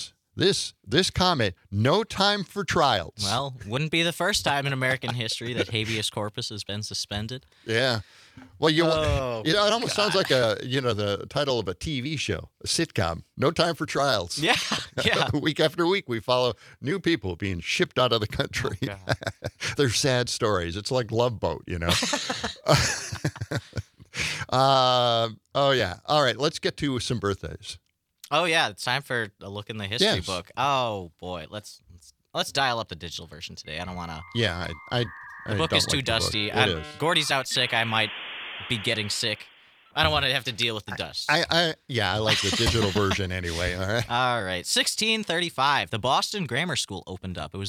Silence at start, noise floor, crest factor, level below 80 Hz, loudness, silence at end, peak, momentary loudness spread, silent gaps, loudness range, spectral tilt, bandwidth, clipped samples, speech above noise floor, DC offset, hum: 0 s; -54 dBFS; 22 dB; -50 dBFS; -25 LUFS; 0 s; -4 dBFS; 11 LU; none; 4 LU; -3.5 dB/octave; 16.5 kHz; under 0.1%; 28 dB; under 0.1%; none